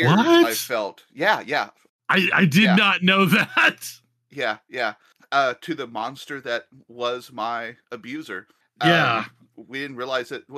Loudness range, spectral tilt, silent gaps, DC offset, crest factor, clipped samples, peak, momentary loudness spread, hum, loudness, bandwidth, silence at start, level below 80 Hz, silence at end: 9 LU; -5 dB/octave; 1.89-1.99 s; under 0.1%; 18 dB; under 0.1%; -4 dBFS; 18 LU; none; -21 LUFS; 15 kHz; 0 s; -76 dBFS; 0 s